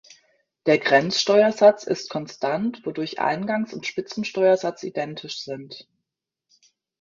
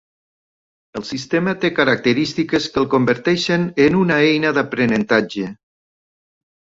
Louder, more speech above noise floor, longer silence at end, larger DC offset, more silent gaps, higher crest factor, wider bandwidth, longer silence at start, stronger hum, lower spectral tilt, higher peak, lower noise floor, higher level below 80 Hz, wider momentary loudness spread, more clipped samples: second, -22 LUFS vs -17 LUFS; second, 61 dB vs over 73 dB; about the same, 1.2 s vs 1.2 s; neither; neither; about the same, 20 dB vs 16 dB; about the same, 7.6 kHz vs 8 kHz; second, 0.65 s vs 0.95 s; neither; about the same, -4.5 dB/octave vs -5.5 dB/octave; about the same, -2 dBFS vs -2 dBFS; second, -83 dBFS vs under -90 dBFS; second, -70 dBFS vs -54 dBFS; about the same, 14 LU vs 12 LU; neither